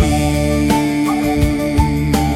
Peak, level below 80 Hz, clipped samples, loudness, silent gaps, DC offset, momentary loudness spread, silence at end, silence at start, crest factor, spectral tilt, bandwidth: 0 dBFS; -24 dBFS; under 0.1%; -16 LUFS; none; under 0.1%; 1 LU; 0 s; 0 s; 14 dB; -6 dB/octave; 16 kHz